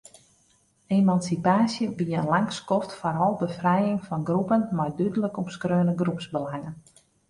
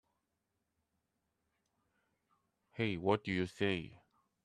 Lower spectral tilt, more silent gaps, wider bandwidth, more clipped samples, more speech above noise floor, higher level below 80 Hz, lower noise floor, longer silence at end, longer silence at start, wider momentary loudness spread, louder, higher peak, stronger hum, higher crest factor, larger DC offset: about the same, -7 dB/octave vs -6.5 dB/octave; neither; about the same, 11.5 kHz vs 11.5 kHz; neither; second, 40 dB vs 50 dB; first, -62 dBFS vs -72 dBFS; second, -64 dBFS vs -86 dBFS; about the same, 0.5 s vs 0.5 s; second, 0.9 s vs 2.75 s; second, 9 LU vs 15 LU; first, -25 LUFS vs -37 LUFS; first, -8 dBFS vs -18 dBFS; neither; second, 18 dB vs 24 dB; neither